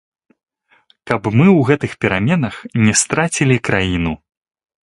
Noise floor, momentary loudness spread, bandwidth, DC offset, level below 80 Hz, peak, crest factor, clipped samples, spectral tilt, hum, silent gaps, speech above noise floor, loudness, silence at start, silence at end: -56 dBFS; 10 LU; 11.5 kHz; under 0.1%; -40 dBFS; 0 dBFS; 16 dB; under 0.1%; -5 dB/octave; none; none; 41 dB; -15 LUFS; 1.05 s; 0.7 s